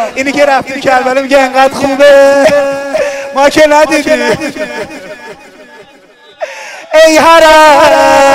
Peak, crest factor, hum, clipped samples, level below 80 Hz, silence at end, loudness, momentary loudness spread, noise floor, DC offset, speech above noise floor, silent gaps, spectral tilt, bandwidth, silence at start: 0 dBFS; 8 dB; none; 2%; -40 dBFS; 0 s; -6 LUFS; 19 LU; -39 dBFS; under 0.1%; 33 dB; none; -3 dB/octave; 16.5 kHz; 0 s